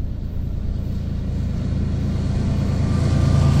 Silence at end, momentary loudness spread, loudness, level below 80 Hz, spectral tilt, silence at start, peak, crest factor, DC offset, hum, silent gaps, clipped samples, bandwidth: 0 s; 10 LU; -22 LUFS; -26 dBFS; -8 dB/octave; 0 s; -6 dBFS; 14 dB; under 0.1%; none; none; under 0.1%; 9.8 kHz